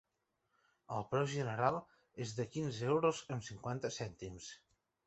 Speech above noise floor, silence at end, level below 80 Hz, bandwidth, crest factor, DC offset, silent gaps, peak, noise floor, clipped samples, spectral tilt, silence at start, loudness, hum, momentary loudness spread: 46 dB; 0.5 s; -70 dBFS; 8.2 kHz; 22 dB; under 0.1%; none; -18 dBFS; -84 dBFS; under 0.1%; -5.5 dB/octave; 0.9 s; -39 LUFS; none; 15 LU